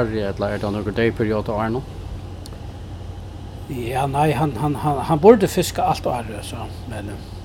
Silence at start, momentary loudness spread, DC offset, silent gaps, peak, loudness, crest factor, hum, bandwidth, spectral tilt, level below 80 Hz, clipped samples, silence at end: 0 s; 19 LU; under 0.1%; none; 0 dBFS; -21 LUFS; 22 dB; none; 17.5 kHz; -6.5 dB/octave; -38 dBFS; under 0.1%; 0 s